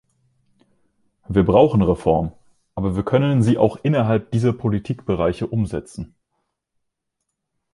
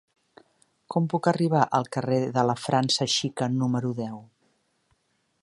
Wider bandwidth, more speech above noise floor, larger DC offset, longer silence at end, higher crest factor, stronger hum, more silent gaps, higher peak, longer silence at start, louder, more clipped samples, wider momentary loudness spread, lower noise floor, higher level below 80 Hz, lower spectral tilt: about the same, 11.5 kHz vs 11.5 kHz; first, 60 dB vs 46 dB; neither; first, 1.7 s vs 1.2 s; about the same, 18 dB vs 20 dB; neither; neither; first, -2 dBFS vs -6 dBFS; first, 1.3 s vs 0.9 s; first, -19 LUFS vs -25 LUFS; neither; first, 15 LU vs 8 LU; first, -78 dBFS vs -71 dBFS; first, -40 dBFS vs -68 dBFS; first, -8.5 dB/octave vs -5 dB/octave